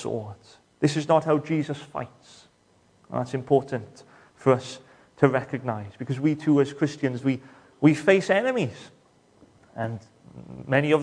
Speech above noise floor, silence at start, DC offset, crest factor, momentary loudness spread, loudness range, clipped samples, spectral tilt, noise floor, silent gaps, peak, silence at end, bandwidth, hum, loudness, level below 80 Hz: 37 dB; 0 s; under 0.1%; 24 dB; 19 LU; 5 LU; under 0.1%; -7 dB/octave; -62 dBFS; none; -2 dBFS; 0 s; 10.5 kHz; none; -25 LUFS; -66 dBFS